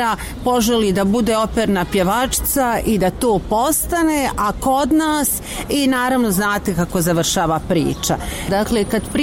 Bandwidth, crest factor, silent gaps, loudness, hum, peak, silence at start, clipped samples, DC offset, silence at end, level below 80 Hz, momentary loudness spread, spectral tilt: 17 kHz; 12 dB; none; -17 LUFS; none; -6 dBFS; 0 s; under 0.1%; 0.2%; 0 s; -34 dBFS; 4 LU; -4.5 dB/octave